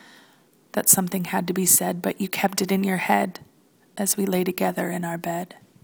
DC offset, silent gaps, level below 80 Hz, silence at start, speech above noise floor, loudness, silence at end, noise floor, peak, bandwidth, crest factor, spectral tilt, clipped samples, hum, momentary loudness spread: under 0.1%; none; -66 dBFS; 0.75 s; 34 dB; -22 LUFS; 0.35 s; -57 dBFS; -2 dBFS; 20 kHz; 24 dB; -3.5 dB/octave; under 0.1%; none; 13 LU